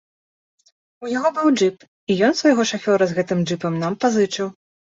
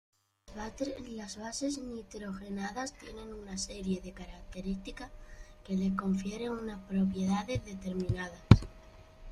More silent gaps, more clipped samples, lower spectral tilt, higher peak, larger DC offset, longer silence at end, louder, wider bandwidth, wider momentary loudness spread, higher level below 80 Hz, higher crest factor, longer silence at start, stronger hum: first, 1.88-2.07 s vs none; neither; about the same, -5 dB/octave vs -6 dB/octave; about the same, -4 dBFS vs -2 dBFS; neither; first, 0.4 s vs 0 s; first, -20 LUFS vs -34 LUFS; second, 8 kHz vs 11.5 kHz; second, 10 LU vs 16 LU; second, -64 dBFS vs -48 dBFS; second, 18 dB vs 32 dB; first, 1 s vs 0.5 s; neither